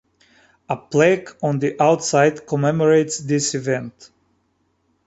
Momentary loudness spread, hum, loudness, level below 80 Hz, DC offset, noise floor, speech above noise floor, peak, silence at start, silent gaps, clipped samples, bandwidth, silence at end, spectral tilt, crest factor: 9 LU; none; -19 LUFS; -60 dBFS; under 0.1%; -66 dBFS; 48 dB; -2 dBFS; 0.7 s; none; under 0.1%; 8.2 kHz; 1.15 s; -5 dB/octave; 18 dB